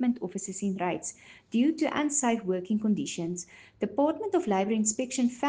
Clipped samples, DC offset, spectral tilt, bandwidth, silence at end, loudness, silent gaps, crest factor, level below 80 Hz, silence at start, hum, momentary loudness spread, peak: under 0.1%; under 0.1%; -4.5 dB/octave; 10 kHz; 0 s; -29 LUFS; none; 16 dB; -70 dBFS; 0 s; none; 9 LU; -12 dBFS